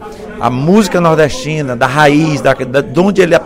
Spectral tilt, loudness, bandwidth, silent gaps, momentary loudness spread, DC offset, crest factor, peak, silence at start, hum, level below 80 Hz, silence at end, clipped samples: -6 dB/octave; -11 LUFS; 16.5 kHz; none; 8 LU; under 0.1%; 10 dB; 0 dBFS; 0 s; none; -36 dBFS; 0 s; 0.3%